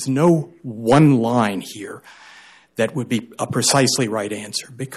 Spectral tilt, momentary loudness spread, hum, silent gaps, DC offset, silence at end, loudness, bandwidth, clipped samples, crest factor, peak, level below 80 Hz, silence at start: -5 dB/octave; 18 LU; none; none; under 0.1%; 0 s; -19 LUFS; 14 kHz; under 0.1%; 16 dB; -4 dBFS; -58 dBFS; 0 s